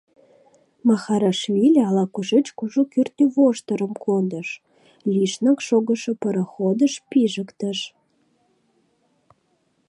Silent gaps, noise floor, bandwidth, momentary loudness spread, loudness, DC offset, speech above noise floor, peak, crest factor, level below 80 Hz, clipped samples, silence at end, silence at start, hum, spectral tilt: none; -67 dBFS; 11 kHz; 10 LU; -21 LUFS; under 0.1%; 47 dB; -6 dBFS; 16 dB; -74 dBFS; under 0.1%; 2 s; 0.85 s; none; -6 dB/octave